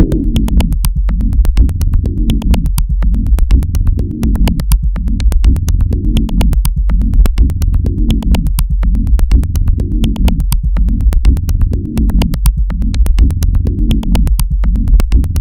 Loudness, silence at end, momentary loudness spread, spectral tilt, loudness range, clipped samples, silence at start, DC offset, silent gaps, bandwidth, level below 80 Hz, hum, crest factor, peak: -14 LUFS; 0 s; 3 LU; -6.5 dB/octave; 0 LU; 0.4%; 0 s; under 0.1%; none; 16 kHz; -10 dBFS; none; 10 dB; 0 dBFS